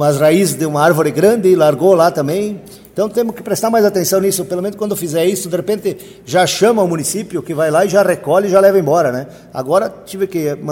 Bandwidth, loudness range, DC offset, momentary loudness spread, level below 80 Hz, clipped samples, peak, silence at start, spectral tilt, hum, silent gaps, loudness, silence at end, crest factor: 17 kHz; 3 LU; under 0.1%; 11 LU; -54 dBFS; under 0.1%; 0 dBFS; 0 s; -5 dB/octave; none; none; -14 LUFS; 0 s; 14 dB